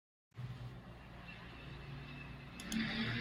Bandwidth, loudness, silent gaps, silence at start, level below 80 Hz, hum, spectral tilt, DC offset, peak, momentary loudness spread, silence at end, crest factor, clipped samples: 16 kHz; -46 LUFS; none; 0.35 s; -58 dBFS; none; -4.5 dB/octave; under 0.1%; -26 dBFS; 15 LU; 0 s; 20 dB; under 0.1%